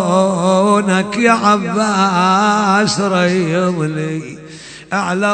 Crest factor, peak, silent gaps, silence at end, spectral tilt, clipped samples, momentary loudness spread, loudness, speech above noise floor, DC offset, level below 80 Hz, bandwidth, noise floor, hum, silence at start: 14 dB; 0 dBFS; none; 0 s; -5 dB/octave; under 0.1%; 11 LU; -14 LUFS; 20 dB; under 0.1%; -52 dBFS; 9.2 kHz; -34 dBFS; none; 0 s